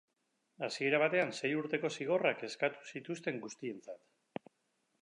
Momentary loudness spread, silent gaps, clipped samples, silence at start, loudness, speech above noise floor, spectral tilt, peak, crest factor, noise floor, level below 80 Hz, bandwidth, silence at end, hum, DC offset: 18 LU; none; under 0.1%; 0.6 s; -35 LUFS; 46 dB; -4.5 dB/octave; -16 dBFS; 20 dB; -81 dBFS; -90 dBFS; 11 kHz; 1.05 s; none; under 0.1%